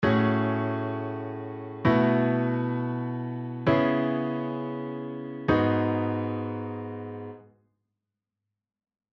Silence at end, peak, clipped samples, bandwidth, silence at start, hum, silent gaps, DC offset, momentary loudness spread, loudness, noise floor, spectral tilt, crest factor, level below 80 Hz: 1.7 s; -8 dBFS; under 0.1%; 6 kHz; 0 s; none; none; under 0.1%; 13 LU; -28 LUFS; -86 dBFS; -9.5 dB/octave; 20 dB; -56 dBFS